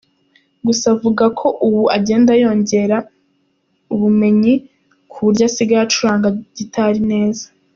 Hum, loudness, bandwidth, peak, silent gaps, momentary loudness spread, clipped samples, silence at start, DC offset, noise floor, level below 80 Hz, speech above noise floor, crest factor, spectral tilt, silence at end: none; -15 LUFS; 7.4 kHz; -2 dBFS; none; 8 LU; under 0.1%; 0.65 s; under 0.1%; -63 dBFS; -54 dBFS; 49 dB; 14 dB; -5.5 dB/octave; 0.3 s